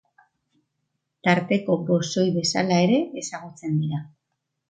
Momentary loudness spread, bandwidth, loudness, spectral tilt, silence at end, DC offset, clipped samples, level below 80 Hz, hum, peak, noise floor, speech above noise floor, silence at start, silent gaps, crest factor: 13 LU; 9.4 kHz; -23 LUFS; -5.5 dB/octave; 0.65 s; under 0.1%; under 0.1%; -68 dBFS; none; -4 dBFS; -79 dBFS; 57 dB; 1.25 s; none; 20 dB